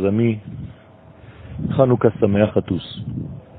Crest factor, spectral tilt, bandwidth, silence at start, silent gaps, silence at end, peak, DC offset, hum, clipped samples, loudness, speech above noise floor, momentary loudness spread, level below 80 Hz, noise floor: 20 dB; -12.5 dB/octave; 4.5 kHz; 0 s; none; 0 s; 0 dBFS; under 0.1%; none; under 0.1%; -20 LUFS; 27 dB; 19 LU; -46 dBFS; -45 dBFS